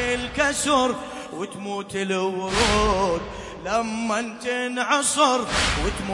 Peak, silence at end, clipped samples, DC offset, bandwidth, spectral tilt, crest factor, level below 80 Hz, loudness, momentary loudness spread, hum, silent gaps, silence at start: -6 dBFS; 0 s; under 0.1%; under 0.1%; 11.5 kHz; -3 dB/octave; 18 dB; -38 dBFS; -23 LUFS; 12 LU; none; none; 0 s